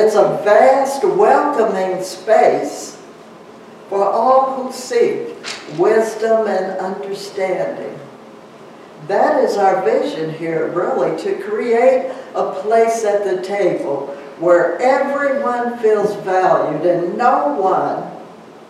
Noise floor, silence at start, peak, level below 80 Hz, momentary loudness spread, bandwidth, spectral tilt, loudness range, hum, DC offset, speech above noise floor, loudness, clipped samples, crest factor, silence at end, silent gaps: -39 dBFS; 0 s; 0 dBFS; -70 dBFS; 12 LU; 13.5 kHz; -5 dB/octave; 4 LU; none; under 0.1%; 23 dB; -16 LUFS; under 0.1%; 16 dB; 0.05 s; none